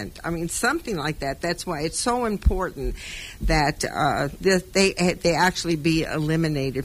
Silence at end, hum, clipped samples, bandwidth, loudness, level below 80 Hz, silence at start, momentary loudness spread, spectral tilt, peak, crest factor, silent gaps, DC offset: 0 s; none; under 0.1%; 16 kHz; -23 LUFS; -34 dBFS; 0 s; 9 LU; -4.5 dB/octave; -6 dBFS; 18 dB; none; under 0.1%